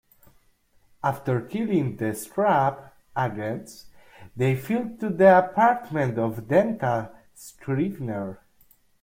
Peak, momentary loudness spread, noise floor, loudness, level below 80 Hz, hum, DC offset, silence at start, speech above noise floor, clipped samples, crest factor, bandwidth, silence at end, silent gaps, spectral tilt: -4 dBFS; 18 LU; -62 dBFS; -24 LUFS; -60 dBFS; none; under 0.1%; 1.05 s; 38 dB; under 0.1%; 20 dB; 16.5 kHz; 0.65 s; none; -7.5 dB/octave